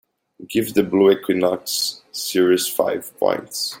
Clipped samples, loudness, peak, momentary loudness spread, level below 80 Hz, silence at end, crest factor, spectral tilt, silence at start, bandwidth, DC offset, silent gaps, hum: under 0.1%; -20 LUFS; -2 dBFS; 8 LU; -62 dBFS; 0 s; 18 dB; -3.5 dB/octave; 0.4 s; 17 kHz; under 0.1%; none; none